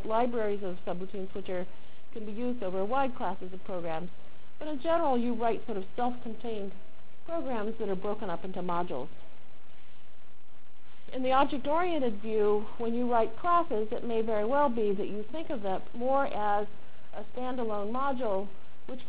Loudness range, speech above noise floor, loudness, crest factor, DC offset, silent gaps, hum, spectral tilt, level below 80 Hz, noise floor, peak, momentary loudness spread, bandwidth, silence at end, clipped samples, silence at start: 7 LU; 30 dB; -32 LUFS; 20 dB; 4%; none; none; -9.5 dB/octave; -60 dBFS; -62 dBFS; -14 dBFS; 14 LU; 4 kHz; 0 s; under 0.1%; 0 s